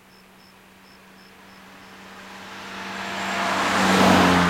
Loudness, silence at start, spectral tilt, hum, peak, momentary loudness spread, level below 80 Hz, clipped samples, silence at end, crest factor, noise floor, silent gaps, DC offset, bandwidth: -20 LUFS; 1.85 s; -4.5 dB/octave; none; -4 dBFS; 26 LU; -56 dBFS; under 0.1%; 0 s; 20 dB; -50 dBFS; none; under 0.1%; 16.5 kHz